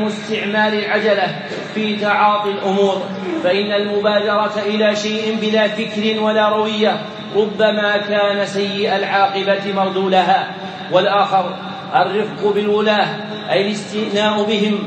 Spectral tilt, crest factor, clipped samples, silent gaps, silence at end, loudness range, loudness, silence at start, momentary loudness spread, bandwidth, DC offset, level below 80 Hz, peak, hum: -5 dB/octave; 16 dB; under 0.1%; none; 0 s; 1 LU; -17 LUFS; 0 s; 6 LU; 8.8 kHz; under 0.1%; -68 dBFS; 0 dBFS; none